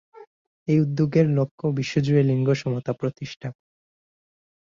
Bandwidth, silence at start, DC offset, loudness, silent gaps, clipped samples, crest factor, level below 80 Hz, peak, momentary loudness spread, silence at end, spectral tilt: 7.4 kHz; 0.2 s; under 0.1%; -23 LUFS; 0.27-0.66 s, 1.51-1.58 s; under 0.1%; 18 dB; -60 dBFS; -6 dBFS; 14 LU; 1.25 s; -8 dB/octave